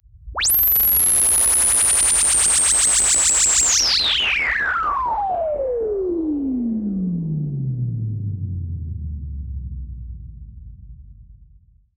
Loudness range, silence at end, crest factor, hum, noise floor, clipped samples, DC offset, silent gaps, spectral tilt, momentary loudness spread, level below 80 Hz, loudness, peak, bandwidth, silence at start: 18 LU; 0.6 s; 14 dB; none; -52 dBFS; under 0.1%; under 0.1%; none; -2 dB/octave; 18 LU; -38 dBFS; -16 LUFS; -6 dBFS; over 20 kHz; 0.15 s